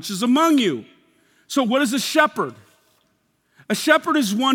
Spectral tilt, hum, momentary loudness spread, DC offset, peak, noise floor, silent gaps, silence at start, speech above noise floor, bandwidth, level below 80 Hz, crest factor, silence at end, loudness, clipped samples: -3.5 dB/octave; none; 10 LU; under 0.1%; 0 dBFS; -66 dBFS; none; 0 s; 47 dB; 18 kHz; -76 dBFS; 20 dB; 0 s; -19 LUFS; under 0.1%